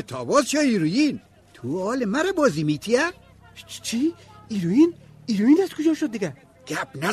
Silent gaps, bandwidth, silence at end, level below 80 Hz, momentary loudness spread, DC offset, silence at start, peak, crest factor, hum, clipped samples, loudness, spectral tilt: none; 13.5 kHz; 0 s; -60 dBFS; 13 LU; under 0.1%; 0 s; -6 dBFS; 16 dB; none; under 0.1%; -23 LUFS; -5 dB/octave